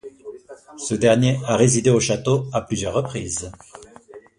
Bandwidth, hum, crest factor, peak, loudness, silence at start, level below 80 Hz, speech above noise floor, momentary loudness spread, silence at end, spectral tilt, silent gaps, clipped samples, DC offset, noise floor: 11.5 kHz; none; 20 dB; -2 dBFS; -20 LUFS; 0.05 s; -48 dBFS; 25 dB; 19 LU; 0.2 s; -5 dB/octave; none; under 0.1%; under 0.1%; -45 dBFS